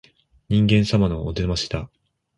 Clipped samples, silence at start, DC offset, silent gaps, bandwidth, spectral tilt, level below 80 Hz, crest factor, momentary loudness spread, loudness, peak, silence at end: under 0.1%; 0.5 s; under 0.1%; none; 11 kHz; -6.5 dB/octave; -36 dBFS; 16 dB; 12 LU; -21 LUFS; -6 dBFS; 0.5 s